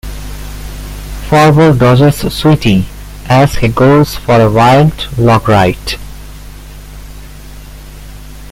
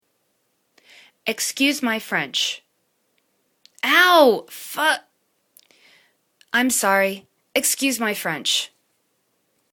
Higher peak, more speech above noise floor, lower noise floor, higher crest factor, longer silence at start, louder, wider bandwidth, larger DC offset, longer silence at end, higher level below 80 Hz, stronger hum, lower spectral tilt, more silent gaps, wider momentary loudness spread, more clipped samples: about the same, 0 dBFS vs 0 dBFS; second, 21 dB vs 50 dB; second, -29 dBFS vs -69 dBFS; second, 10 dB vs 22 dB; second, 0.05 s vs 1.25 s; first, -9 LUFS vs -19 LUFS; second, 16.5 kHz vs 19 kHz; neither; second, 0 s vs 1.05 s; first, -26 dBFS vs -72 dBFS; first, 50 Hz at -30 dBFS vs none; first, -6.5 dB/octave vs -1.5 dB/octave; neither; first, 19 LU vs 12 LU; neither